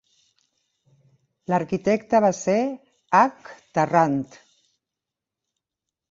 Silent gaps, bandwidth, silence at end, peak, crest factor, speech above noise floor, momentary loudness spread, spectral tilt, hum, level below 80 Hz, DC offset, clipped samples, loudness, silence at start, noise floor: none; 7.8 kHz; 1.85 s; -4 dBFS; 22 dB; 65 dB; 10 LU; -6 dB/octave; none; -66 dBFS; under 0.1%; under 0.1%; -22 LUFS; 1.5 s; -87 dBFS